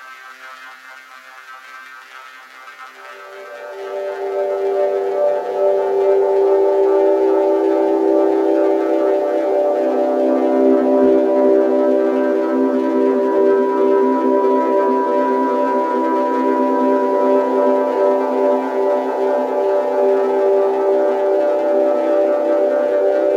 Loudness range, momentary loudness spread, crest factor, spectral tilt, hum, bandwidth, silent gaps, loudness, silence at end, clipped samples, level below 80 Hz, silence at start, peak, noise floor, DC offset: 9 LU; 20 LU; 14 dB; -5.5 dB/octave; none; 7.4 kHz; none; -16 LUFS; 0 s; under 0.1%; -70 dBFS; 0 s; -2 dBFS; -39 dBFS; under 0.1%